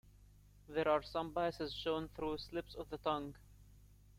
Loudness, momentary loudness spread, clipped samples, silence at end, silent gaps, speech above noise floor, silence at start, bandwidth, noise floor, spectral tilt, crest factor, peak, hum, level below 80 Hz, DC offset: -40 LUFS; 10 LU; under 0.1%; 0 s; none; 24 dB; 0.05 s; 16 kHz; -63 dBFS; -6 dB/octave; 20 dB; -22 dBFS; 50 Hz at -60 dBFS; -60 dBFS; under 0.1%